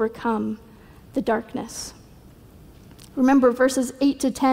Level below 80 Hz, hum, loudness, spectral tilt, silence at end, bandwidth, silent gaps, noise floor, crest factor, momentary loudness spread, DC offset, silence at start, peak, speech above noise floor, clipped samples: -52 dBFS; none; -22 LUFS; -4.5 dB/octave; 0 s; 16 kHz; none; -48 dBFS; 16 dB; 17 LU; under 0.1%; 0 s; -8 dBFS; 26 dB; under 0.1%